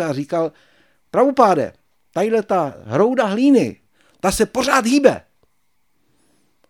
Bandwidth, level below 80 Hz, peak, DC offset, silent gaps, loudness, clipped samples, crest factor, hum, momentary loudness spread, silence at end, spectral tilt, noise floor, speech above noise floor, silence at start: 17.5 kHz; -48 dBFS; 0 dBFS; under 0.1%; none; -18 LUFS; under 0.1%; 18 dB; none; 10 LU; 1.5 s; -5 dB/octave; -69 dBFS; 53 dB; 0 s